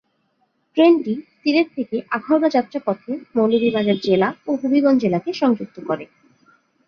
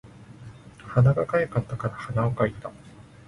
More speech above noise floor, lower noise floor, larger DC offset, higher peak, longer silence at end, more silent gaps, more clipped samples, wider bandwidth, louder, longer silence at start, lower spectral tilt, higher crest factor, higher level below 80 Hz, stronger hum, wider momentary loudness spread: first, 48 dB vs 21 dB; first, -67 dBFS vs -45 dBFS; neither; first, -2 dBFS vs -8 dBFS; first, 0.8 s vs 0.25 s; neither; neither; second, 6.6 kHz vs 10.5 kHz; first, -19 LUFS vs -25 LUFS; first, 0.75 s vs 0.05 s; second, -7 dB/octave vs -9 dB/octave; about the same, 18 dB vs 18 dB; second, -64 dBFS vs -52 dBFS; neither; second, 11 LU vs 24 LU